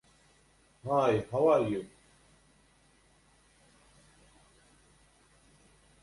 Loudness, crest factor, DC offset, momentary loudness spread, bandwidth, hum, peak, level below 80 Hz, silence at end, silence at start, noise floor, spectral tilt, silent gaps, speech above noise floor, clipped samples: -29 LUFS; 22 dB; under 0.1%; 17 LU; 11.5 kHz; none; -14 dBFS; -66 dBFS; 4.15 s; 0.85 s; -65 dBFS; -7 dB/octave; none; 38 dB; under 0.1%